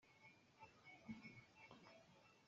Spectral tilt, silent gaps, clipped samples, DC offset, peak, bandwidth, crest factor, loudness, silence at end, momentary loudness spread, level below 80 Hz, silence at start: -4 dB/octave; none; under 0.1%; under 0.1%; -42 dBFS; 7.4 kHz; 22 dB; -63 LUFS; 0 s; 10 LU; -88 dBFS; 0 s